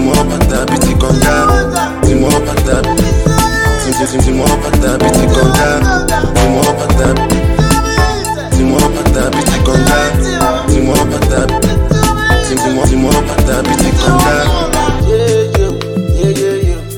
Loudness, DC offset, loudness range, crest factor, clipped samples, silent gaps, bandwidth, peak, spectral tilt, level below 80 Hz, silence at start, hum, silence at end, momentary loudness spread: -11 LUFS; under 0.1%; 1 LU; 10 dB; under 0.1%; none; 17.5 kHz; 0 dBFS; -5 dB/octave; -16 dBFS; 0 s; none; 0 s; 3 LU